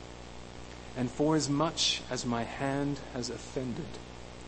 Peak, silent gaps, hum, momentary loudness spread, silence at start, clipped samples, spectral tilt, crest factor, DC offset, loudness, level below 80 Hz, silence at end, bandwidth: -14 dBFS; none; 60 Hz at -50 dBFS; 19 LU; 0 s; under 0.1%; -4 dB/octave; 20 dB; under 0.1%; -32 LUFS; -52 dBFS; 0 s; 8.8 kHz